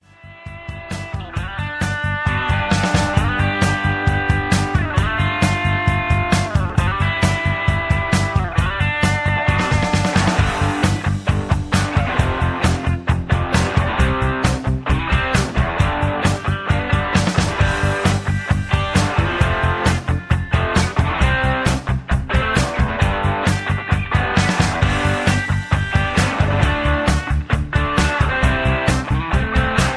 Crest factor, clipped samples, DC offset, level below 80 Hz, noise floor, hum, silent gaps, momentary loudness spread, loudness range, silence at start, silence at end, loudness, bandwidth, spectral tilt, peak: 16 dB; under 0.1%; under 0.1%; -26 dBFS; -38 dBFS; none; none; 4 LU; 1 LU; 0.25 s; 0 s; -18 LUFS; 11 kHz; -5.5 dB/octave; 0 dBFS